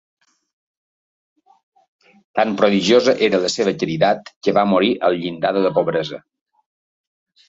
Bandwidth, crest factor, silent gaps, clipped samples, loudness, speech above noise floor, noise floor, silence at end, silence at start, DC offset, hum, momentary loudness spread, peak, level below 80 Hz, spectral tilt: 8 kHz; 18 dB; 4.36-4.41 s; under 0.1%; -18 LUFS; over 73 dB; under -90 dBFS; 1.3 s; 2.35 s; under 0.1%; none; 7 LU; -2 dBFS; -60 dBFS; -5 dB/octave